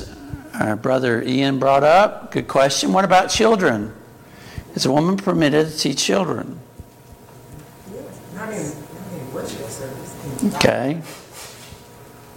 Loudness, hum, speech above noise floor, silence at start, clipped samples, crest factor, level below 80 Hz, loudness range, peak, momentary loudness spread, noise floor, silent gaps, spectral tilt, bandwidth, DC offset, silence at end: -18 LUFS; none; 26 dB; 0 s; under 0.1%; 20 dB; -50 dBFS; 15 LU; 0 dBFS; 21 LU; -44 dBFS; none; -4.5 dB/octave; 17 kHz; under 0.1%; 0.05 s